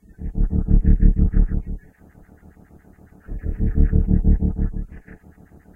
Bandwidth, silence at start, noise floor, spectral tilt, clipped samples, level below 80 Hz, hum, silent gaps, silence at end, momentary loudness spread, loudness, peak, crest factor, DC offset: 2.1 kHz; 0.2 s; -48 dBFS; -12.5 dB/octave; under 0.1%; -20 dBFS; none; none; 0.6 s; 18 LU; -22 LUFS; -2 dBFS; 16 dB; under 0.1%